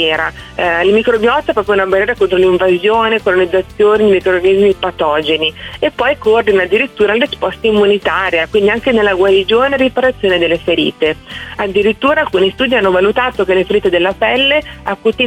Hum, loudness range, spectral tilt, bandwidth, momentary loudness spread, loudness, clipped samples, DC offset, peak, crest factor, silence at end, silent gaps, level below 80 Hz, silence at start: none; 2 LU; -5.5 dB/octave; 10 kHz; 5 LU; -12 LUFS; under 0.1%; under 0.1%; -2 dBFS; 10 dB; 0 s; none; -38 dBFS; 0 s